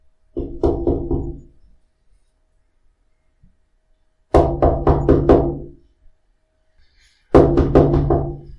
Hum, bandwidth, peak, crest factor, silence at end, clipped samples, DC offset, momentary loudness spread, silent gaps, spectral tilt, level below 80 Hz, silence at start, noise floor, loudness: none; 10.5 kHz; 0 dBFS; 20 dB; 0.05 s; under 0.1%; under 0.1%; 17 LU; none; -10 dB/octave; -28 dBFS; 0.35 s; -62 dBFS; -17 LUFS